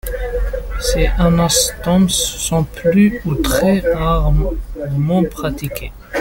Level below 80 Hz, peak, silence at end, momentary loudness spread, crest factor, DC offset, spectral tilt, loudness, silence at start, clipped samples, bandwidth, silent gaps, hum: -22 dBFS; -2 dBFS; 0 s; 10 LU; 14 dB; under 0.1%; -5 dB/octave; -16 LUFS; 0.05 s; under 0.1%; 17 kHz; none; none